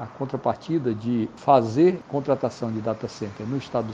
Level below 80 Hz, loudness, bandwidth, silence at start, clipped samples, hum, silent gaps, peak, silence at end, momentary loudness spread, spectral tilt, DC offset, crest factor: -60 dBFS; -24 LUFS; 7.8 kHz; 0 s; under 0.1%; none; none; -4 dBFS; 0 s; 11 LU; -8 dB/octave; under 0.1%; 20 dB